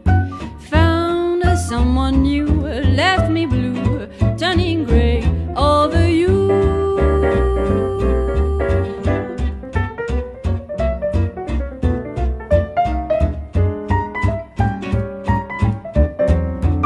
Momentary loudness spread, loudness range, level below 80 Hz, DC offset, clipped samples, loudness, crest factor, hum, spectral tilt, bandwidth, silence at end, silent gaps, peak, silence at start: 8 LU; 5 LU; -24 dBFS; under 0.1%; under 0.1%; -18 LUFS; 14 dB; none; -7.5 dB/octave; 12 kHz; 0 s; none; -2 dBFS; 0.05 s